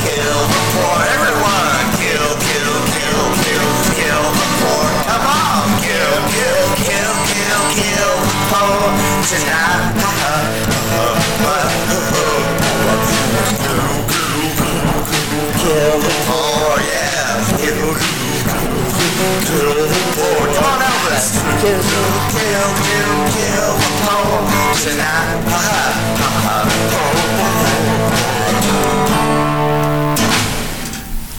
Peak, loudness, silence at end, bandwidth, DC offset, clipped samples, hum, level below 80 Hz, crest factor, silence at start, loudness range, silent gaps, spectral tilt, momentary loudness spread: -2 dBFS; -14 LUFS; 0 s; over 20 kHz; 3%; under 0.1%; none; -32 dBFS; 14 dB; 0 s; 1 LU; none; -3.5 dB/octave; 3 LU